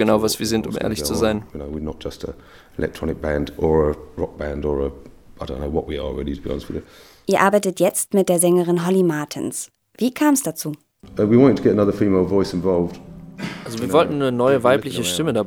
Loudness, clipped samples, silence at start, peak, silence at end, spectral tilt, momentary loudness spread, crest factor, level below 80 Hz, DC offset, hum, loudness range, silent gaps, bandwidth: -20 LUFS; under 0.1%; 0 s; 0 dBFS; 0 s; -5 dB/octave; 15 LU; 20 dB; -40 dBFS; under 0.1%; none; 6 LU; none; 19.5 kHz